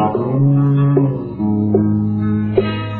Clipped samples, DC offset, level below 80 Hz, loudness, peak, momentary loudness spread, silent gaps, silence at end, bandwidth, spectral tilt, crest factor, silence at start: under 0.1%; under 0.1%; -44 dBFS; -16 LUFS; -2 dBFS; 5 LU; none; 0 s; 4.3 kHz; -12 dB/octave; 14 dB; 0 s